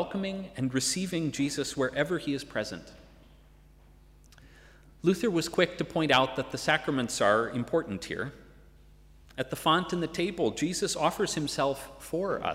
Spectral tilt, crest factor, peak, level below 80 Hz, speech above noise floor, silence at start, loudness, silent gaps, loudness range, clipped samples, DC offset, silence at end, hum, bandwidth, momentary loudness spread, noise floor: -4 dB/octave; 20 dB; -10 dBFS; -56 dBFS; 27 dB; 0 s; -29 LUFS; none; 7 LU; under 0.1%; under 0.1%; 0 s; none; 16 kHz; 10 LU; -56 dBFS